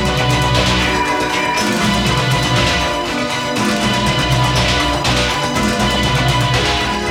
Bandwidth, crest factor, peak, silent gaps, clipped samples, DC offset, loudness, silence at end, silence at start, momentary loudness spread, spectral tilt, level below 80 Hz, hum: over 20 kHz; 12 dB; -2 dBFS; none; under 0.1%; under 0.1%; -15 LUFS; 0 s; 0 s; 3 LU; -4 dB/octave; -28 dBFS; none